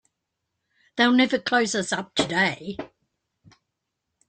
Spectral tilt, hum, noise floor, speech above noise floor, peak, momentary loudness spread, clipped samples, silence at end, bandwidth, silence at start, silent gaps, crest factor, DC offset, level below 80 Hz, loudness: -3.5 dB/octave; none; -81 dBFS; 58 dB; -4 dBFS; 17 LU; under 0.1%; 1.45 s; 9.4 kHz; 0.95 s; none; 22 dB; under 0.1%; -64 dBFS; -22 LUFS